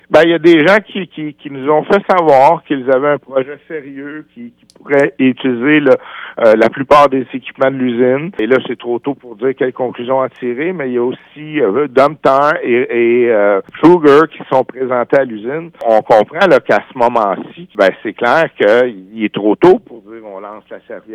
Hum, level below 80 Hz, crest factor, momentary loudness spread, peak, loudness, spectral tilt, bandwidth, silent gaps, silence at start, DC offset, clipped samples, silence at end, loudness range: none; -52 dBFS; 12 dB; 16 LU; 0 dBFS; -12 LUFS; -7 dB/octave; 10 kHz; none; 0.1 s; under 0.1%; under 0.1%; 0 s; 5 LU